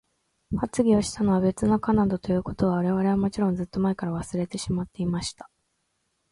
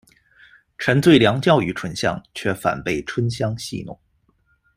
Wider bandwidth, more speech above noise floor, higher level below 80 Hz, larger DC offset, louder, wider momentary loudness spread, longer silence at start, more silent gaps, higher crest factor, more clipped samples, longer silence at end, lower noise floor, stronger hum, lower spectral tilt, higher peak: second, 11.5 kHz vs 16 kHz; first, 50 dB vs 44 dB; about the same, -48 dBFS vs -50 dBFS; neither; second, -25 LUFS vs -20 LUFS; second, 8 LU vs 14 LU; second, 0.5 s vs 0.8 s; neither; about the same, 16 dB vs 20 dB; neither; about the same, 0.85 s vs 0.8 s; first, -74 dBFS vs -63 dBFS; neither; about the same, -6.5 dB/octave vs -6 dB/octave; second, -10 dBFS vs -2 dBFS